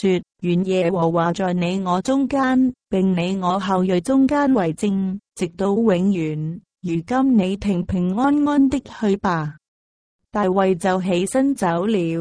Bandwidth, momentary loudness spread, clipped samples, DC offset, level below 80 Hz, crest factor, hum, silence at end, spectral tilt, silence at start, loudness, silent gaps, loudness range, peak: 10.5 kHz; 7 LU; under 0.1%; under 0.1%; -48 dBFS; 14 dB; none; 0 s; -7 dB/octave; 0 s; -20 LUFS; 9.68-10.19 s; 2 LU; -6 dBFS